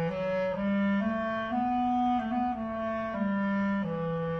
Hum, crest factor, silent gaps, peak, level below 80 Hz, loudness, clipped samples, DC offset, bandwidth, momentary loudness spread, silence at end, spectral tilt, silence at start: none; 10 dB; none; -20 dBFS; -56 dBFS; -30 LUFS; under 0.1%; under 0.1%; 6.2 kHz; 4 LU; 0 s; -8.5 dB/octave; 0 s